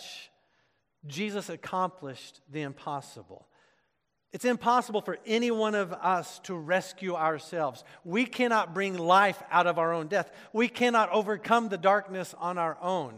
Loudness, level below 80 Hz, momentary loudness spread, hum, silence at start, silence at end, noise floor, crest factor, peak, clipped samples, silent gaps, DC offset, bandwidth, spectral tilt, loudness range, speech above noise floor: -28 LUFS; -80 dBFS; 14 LU; none; 0 s; 0 s; -78 dBFS; 20 dB; -8 dBFS; under 0.1%; none; under 0.1%; 15.5 kHz; -4.5 dB/octave; 11 LU; 49 dB